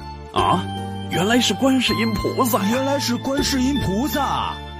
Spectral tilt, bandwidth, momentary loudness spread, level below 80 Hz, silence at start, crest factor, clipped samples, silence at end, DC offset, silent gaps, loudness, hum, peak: -4.5 dB/octave; 15.5 kHz; 6 LU; -38 dBFS; 0 s; 14 dB; under 0.1%; 0 s; under 0.1%; none; -20 LUFS; none; -6 dBFS